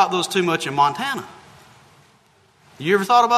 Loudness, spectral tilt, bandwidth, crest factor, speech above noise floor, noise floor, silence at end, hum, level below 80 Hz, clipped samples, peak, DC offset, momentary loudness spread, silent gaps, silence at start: -20 LUFS; -4 dB/octave; 13.5 kHz; 20 dB; 38 dB; -56 dBFS; 0 s; none; -66 dBFS; under 0.1%; -2 dBFS; under 0.1%; 13 LU; none; 0 s